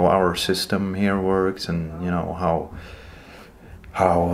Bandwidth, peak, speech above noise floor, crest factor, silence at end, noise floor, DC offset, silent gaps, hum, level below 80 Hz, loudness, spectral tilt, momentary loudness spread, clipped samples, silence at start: 16 kHz; -2 dBFS; 22 dB; 20 dB; 0 s; -44 dBFS; under 0.1%; none; none; -44 dBFS; -22 LUFS; -5.5 dB/octave; 21 LU; under 0.1%; 0 s